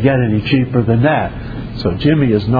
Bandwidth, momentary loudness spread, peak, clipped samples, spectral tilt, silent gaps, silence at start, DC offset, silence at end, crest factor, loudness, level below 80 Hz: 5 kHz; 10 LU; 0 dBFS; under 0.1%; -10 dB/octave; none; 0 s; under 0.1%; 0 s; 14 dB; -15 LUFS; -32 dBFS